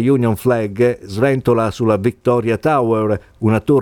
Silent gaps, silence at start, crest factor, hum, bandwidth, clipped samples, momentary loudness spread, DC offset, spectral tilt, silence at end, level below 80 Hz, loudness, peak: none; 0 s; 14 dB; none; 18.5 kHz; under 0.1%; 3 LU; under 0.1%; -8 dB/octave; 0 s; -46 dBFS; -16 LUFS; -2 dBFS